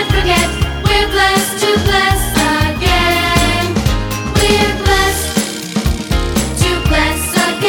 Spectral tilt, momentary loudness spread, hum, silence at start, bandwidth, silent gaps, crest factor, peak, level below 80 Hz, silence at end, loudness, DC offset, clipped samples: -4 dB/octave; 5 LU; none; 0 s; over 20 kHz; none; 14 dB; 0 dBFS; -22 dBFS; 0 s; -13 LUFS; under 0.1%; under 0.1%